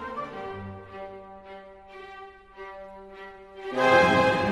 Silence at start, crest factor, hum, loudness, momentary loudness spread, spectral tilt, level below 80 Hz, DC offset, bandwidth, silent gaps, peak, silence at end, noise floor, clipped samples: 0 s; 22 dB; none; -23 LUFS; 26 LU; -5 dB/octave; -56 dBFS; under 0.1%; 12 kHz; none; -6 dBFS; 0 s; -46 dBFS; under 0.1%